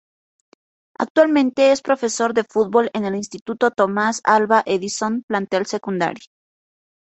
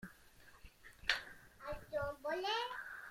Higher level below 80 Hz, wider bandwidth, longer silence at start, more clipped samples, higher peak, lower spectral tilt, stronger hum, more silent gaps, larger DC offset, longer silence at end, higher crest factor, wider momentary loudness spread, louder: about the same, -64 dBFS vs -62 dBFS; second, 8.2 kHz vs 16.5 kHz; first, 1 s vs 0 s; neither; first, -2 dBFS vs -16 dBFS; about the same, -4 dB/octave vs -3 dB/octave; neither; first, 1.10-1.15 s, 3.41-3.45 s, 5.23-5.28 s vs none; neither; first, 0.95 s vs 0 s; second, 18 dB vs 28 dB; second, 9 LU vs 22 LU; first, -19 LUFS vs -41 LUFS